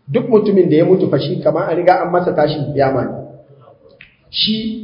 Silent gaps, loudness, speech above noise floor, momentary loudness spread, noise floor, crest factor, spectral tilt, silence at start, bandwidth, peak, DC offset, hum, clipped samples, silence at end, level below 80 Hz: none; -15 LUFS; 31 dB; 7 LU; -45 dBFS; 16 dB; -9.5 dB/octave; 0.1 s; 5.4 kHz; 0 dBFS; under 0.1%; none; under 0.1%; 0 s; -50 dBFS